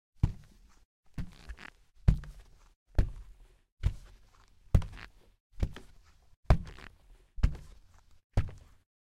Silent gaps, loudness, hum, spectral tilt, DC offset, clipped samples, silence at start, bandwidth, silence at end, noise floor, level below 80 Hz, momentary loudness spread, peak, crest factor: 0.85-1.03 s, 2.76-2.86 s, 3.72-3.77 s, 5.40-5.50 s, 6.37-6.43 s, 8.24-8.30 s; -35 LUFS; none; -7.5 dB/octave; under 0.1%; under 0.1%; 0.25 s; 11 kHz; 0.45 s; -60 dBFS; -38 dBFS; 22 LU; -8 dBFS; 26 dB